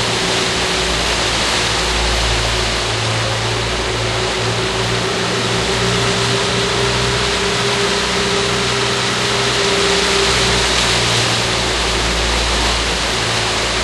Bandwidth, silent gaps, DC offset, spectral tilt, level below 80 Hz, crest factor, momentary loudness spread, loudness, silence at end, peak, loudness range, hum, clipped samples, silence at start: 13 kHz; none; under 0.1%; -2.5 dB/octave; -28 dBFS; 14 dB; 4 LU; -15 LUFS; 0 s; -2 dBFS; 3 LU; none; under 0.1%; 0 s